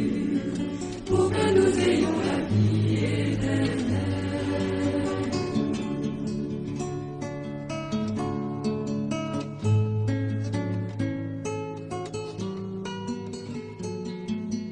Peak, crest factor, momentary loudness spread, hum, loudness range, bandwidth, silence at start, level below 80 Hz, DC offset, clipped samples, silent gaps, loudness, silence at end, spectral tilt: -10 dBFS; 18 dB; 11 LU; none; 8 LU; 10 kHz; 0 s; -50 dBFS; under 0.1%; under 0.1%; none; -28 LUFS; 0 s; -6.5 dB/octave